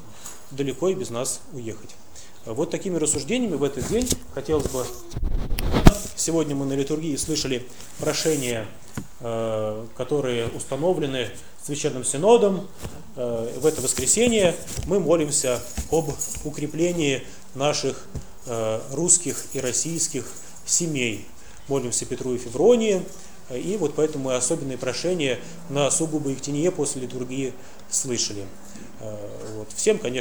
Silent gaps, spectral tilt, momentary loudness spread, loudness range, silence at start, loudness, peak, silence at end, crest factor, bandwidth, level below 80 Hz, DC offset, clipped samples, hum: none; -4 dB/octave; 18 LU; 5 LU; 0 s; -24 LUFS; 0 dBFS; 0 s; 24 dB; over 20 kHz; -36 dBFS; 1%; under 0.1%; none